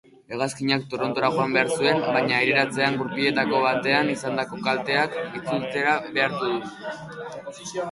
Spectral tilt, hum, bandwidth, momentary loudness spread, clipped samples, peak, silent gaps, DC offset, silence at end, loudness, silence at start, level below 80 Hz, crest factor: -4.5 dB/octave; none; 11.5 kHz; 14 LU; under 0.1%; -4 dBFS; none; under 0.1%; 0 s; -23 LUFS; 0.3 s; -64 dBFS; 20 dB